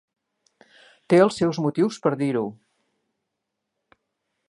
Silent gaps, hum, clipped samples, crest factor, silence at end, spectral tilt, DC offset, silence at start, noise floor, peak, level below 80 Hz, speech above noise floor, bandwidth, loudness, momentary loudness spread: none; none; under 0.1%; 22 dB; 1.95 s; -6.5 dB/octave; under 0.1%; 1.1 s; -81 dBFS; -4 dBFS; -68 dBFS; 60 dB; 11.5 kHz; -22 LUFS; 8 LU